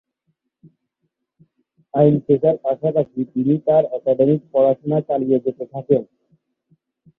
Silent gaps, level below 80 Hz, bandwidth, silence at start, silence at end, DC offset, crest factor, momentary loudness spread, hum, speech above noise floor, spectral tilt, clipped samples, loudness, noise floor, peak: none; -60 dBFS; 4 kHz; 1.95 s; 1.15 s; under 0.1%; 18 dB; 6 LU; none; 57 dB; -12.5 dB/octave; under 0.1%; -19 LUFS; -75 dBFS; -2 dBFS